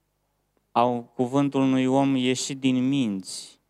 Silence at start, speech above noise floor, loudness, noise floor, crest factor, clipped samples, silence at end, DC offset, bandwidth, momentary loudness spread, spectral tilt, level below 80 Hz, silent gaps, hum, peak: 0.75 s; 50 dB; -24 LUFS; -73 dBFS; 18 dB; under 0.1%; 0.2 s; under 0.1%; 12 kHz; 7 LU; -5.5 dB/octave; -74 dBFS; none; 50 Hz at -65 dBFS; -6 dBFS